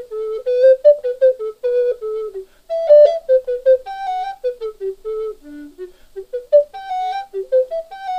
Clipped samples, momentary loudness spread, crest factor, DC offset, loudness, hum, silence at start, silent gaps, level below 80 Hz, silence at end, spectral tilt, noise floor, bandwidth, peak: under 0.1%; 20 LU; 16 dB; under 0.1%; -17 LUFS; none; 0 s; none; -54 dBFS; 0 s; -4 dB/octave; -36 dBFS; 6.6 kHz; -2 dBFS